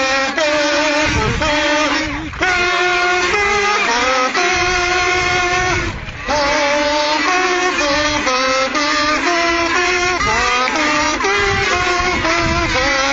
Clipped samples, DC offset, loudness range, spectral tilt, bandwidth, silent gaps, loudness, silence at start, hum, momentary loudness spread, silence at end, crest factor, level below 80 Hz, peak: under 0.1%; under 0.1%; 1 LU; -2.5 dB/octave; 8.2 kHz; none; -14 LUFS; 0 s; none; 2 LU; 0 s; 14 dB; -34 dBFS; -2 dBFS